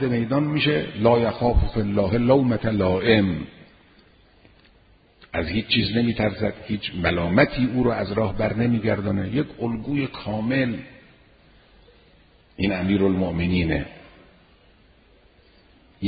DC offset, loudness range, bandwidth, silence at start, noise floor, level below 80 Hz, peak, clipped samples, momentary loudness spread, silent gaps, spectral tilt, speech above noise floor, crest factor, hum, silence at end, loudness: under 0.1%; 6 LU; 5 kHz; 0 s; -56 dBFS; -38 dBFS; -4 dBFS; under 0.1%; 9 LU; none; -11.5 dB/octave; 34 dB; 20 dB; none; 0 s; -22 LUFS